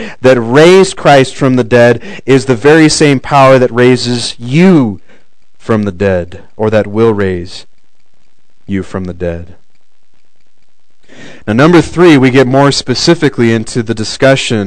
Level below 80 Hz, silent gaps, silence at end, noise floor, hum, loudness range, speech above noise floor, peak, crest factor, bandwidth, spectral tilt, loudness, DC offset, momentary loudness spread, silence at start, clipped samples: -40 dBFS; none; 0 s; -60 dBFS; none; 16 LU; 52 dB; 0 dBFS; 10 dB; 12 kHz; -5.5 dB/octave; -8 LUFS; 4%; 14 LU; 0 s; 5%